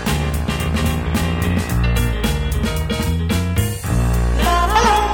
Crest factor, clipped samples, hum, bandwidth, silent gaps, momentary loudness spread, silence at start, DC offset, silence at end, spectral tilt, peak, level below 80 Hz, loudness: 14 dB; under 0.1%; none; 19 kHz; none; 6 LU; 0 s; under 0.1%; 0 s; -5 dB/octave; -2 dBFS; -22 dBFS; -18 LUFS